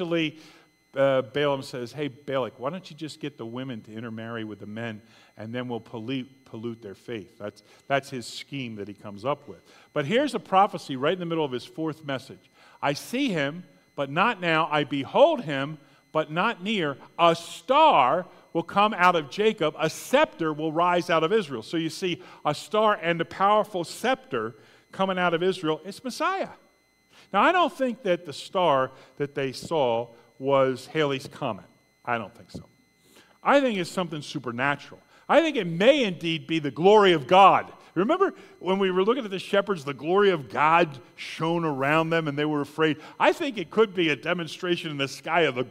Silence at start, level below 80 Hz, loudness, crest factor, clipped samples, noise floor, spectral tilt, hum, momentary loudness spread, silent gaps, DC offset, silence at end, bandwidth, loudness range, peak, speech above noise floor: 0 s; -70 dBFS; -25 LUFS; 22 dB; under 0.1%; -63 dBFS; -5 dB/octave; none; 15 LU; none; under 0.1%; 0 s; 16 kHz; 12 LU; -4 dBFS; 38 dB